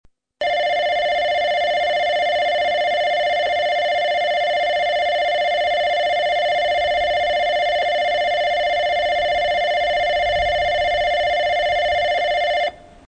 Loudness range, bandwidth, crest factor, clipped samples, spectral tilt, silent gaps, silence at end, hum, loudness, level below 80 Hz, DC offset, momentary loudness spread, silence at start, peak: 0 LU; 8.2 kHz; 10 dB; under 0.1%; -2 dB/octave; none; 0.3 s; none; -19 LUFS; -46 dBFS; under 0.1%; 0 LU; 0.4 s; -10 dBFS